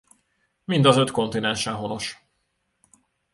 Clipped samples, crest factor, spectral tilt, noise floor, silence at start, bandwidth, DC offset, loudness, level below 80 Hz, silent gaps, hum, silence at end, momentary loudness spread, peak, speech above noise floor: under 0.1%; 22 dB; -5 dB/octave; -73 dBFS; 0.7 s; 11.5 kHz; under 0.1%; -22 LUFS; -58 dBFS; none; none; 1.2 s; 14 LU; -2 dBFS; 52 dB